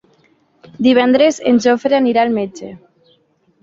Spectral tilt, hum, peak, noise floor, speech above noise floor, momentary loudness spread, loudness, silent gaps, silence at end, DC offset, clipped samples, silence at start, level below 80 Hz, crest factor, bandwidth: -4.5 dB/octave; none; -2 dBFS; -57 dBFS; 44 dB; 14 LU; -13 LUFS; none; 0.85 s; under 0.1%; under 0.1%; 0.8 s; -58 dBFS; 14 dB; 7.8 kHz